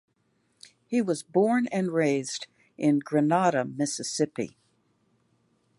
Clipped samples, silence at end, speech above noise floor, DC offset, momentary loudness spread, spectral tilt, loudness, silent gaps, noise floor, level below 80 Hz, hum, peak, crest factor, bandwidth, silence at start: under 0.1%; 1.3 s; 45 dB; under 0.1%; 12 LU; -5 dB/octave; -27 LUFS; none; -71 dBFS; -76 dBFS; none; -10 dBFS; 18 dB; 11.5 kHz; 0.9 s